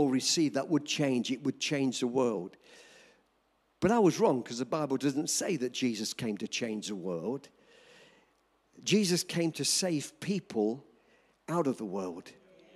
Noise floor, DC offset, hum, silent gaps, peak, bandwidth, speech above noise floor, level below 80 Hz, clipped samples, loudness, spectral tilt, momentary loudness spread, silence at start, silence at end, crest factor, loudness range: -73 dBFS; under 0.1%; none; none; -14 dBFS; 15.5 kHz; 42 dB; -72 dBFS; under 0.1%; -31 LUFS; -4 dB/octave; 10 LU; 0 s; 0.45 s; 18 dB; 4 LU